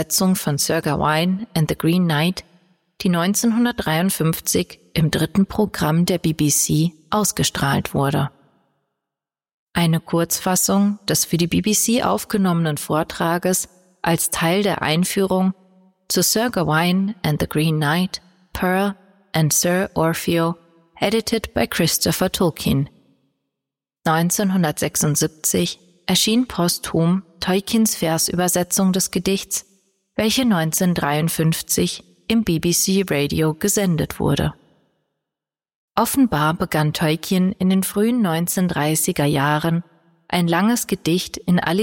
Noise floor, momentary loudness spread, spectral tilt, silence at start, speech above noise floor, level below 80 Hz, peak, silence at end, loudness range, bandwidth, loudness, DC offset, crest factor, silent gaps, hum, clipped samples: -87 dBFS; 5 LU; -4.5 dB/octave; 0 s; 68 dB; -46 dBFS; -4 dBFS; 0 s; 3 LU; 17 kHz; -19 LUFS; under 0.1%; 16 dB; 9.54-9.67 s, 35.75-35.88 s; none; under 0.1%